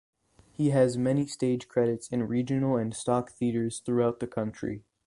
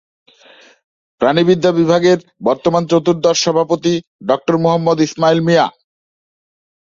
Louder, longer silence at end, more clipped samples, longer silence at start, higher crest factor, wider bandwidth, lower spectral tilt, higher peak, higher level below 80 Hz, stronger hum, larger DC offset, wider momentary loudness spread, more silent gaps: second, -29 LUFS vs -14 LUFS; second, 0.25 s vs 1.15 s; neither; second, 0.6 s vs 1.2 s; about the same, 18 dB vs 14 dB; first, 11.5 kHz vs 7.6 kHz; first, -7 dB/octave vs -5.5 dB/octave; second, -10 dBFS vs 0 dBFS; about the same, -60 dBFS vs -56 dBFS; neither; neither; about the same, 8 LU vs 6 LU; second, none vs 4.07-4.19 s